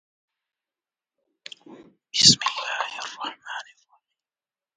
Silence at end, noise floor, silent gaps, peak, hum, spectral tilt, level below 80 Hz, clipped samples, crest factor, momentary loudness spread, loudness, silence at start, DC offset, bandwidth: 1.15 s; under -90 dBFS; none; 0 dBFS; none; -1 dB/octave; -64 dBFS; under 0.1%; 28 dB; 27 LU; -20 LUFS; 1.7 s; under 0.1%; 10 kHz